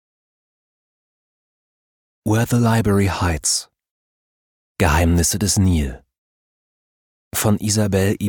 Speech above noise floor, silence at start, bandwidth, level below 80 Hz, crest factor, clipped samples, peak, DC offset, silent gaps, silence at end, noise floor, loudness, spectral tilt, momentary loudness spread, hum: over 73 dB; 2.25 s; 19 kHz; -34 dBFS; 18 dB; under 0.1%; -4 dBFS; under 0.1%; 3.91-4.75 s, 6.18-7.31 s; 0 s; under -90 dBFS; -18 LUFS; -4.5 dB/octave; 6 LU; none